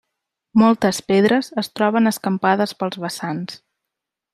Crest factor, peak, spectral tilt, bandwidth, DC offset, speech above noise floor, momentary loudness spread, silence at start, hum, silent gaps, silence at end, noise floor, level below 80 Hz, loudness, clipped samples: 18 dB; -2 dBFS; -5.5 dB/octave; 14.5 kHz; under 0.1%; 64 dB; 11 LU; 0.55 s; none; none; 0.75 s; -83 dBFS; -62 dBFS; -19 LUFS; under 0.1%